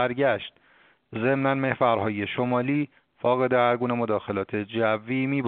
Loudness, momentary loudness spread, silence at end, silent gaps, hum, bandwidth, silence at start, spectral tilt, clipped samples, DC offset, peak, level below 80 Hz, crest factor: -25 LUFS; 7 LU; 0 s; none; none; 4.5 kHz; 0 s; -5 dB/octave; under 0.1%; under 0.1%; -6 dBFS; -66 dBFS; 18 dB